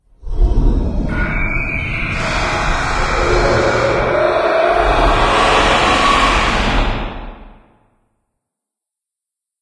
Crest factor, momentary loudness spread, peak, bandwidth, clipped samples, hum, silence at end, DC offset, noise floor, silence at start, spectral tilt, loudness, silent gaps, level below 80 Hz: 16 dB; 8 LU; 0 dBFS; 10.5 kHz; under 0.1%; none; 2.1 s; under 0.1%; -84 dBFS; 0.2 s; -4.5 dB/octave; -15 LUFS; none; -20 dBFS